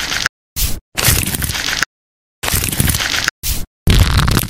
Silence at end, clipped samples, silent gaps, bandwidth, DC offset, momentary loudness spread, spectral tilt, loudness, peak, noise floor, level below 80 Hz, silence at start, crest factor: 0 s; under 0.1%; 0.29-0.56 s, 0.81-0.92 s, 1.86-2.42 s, 3.31-3.42 s, 3.67-3.86 s; over 20 kHz; under 0.1%; 8 LU; -3 dB/octave; -16 LUFS; 0 dBFS; under -90 dBFS; -22 dBFS; 0 s; 16 dB